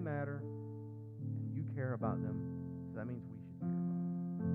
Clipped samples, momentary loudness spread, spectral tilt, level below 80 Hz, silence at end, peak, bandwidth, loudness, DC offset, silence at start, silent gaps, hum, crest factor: under 0.1%; 9 LU; -12.5 dB/octave; -70 dBFS; 0 s; -24 dBFS; 2.8 kHz; -42 LUFS; under 0.1%; 0 s; none; none; 16 dB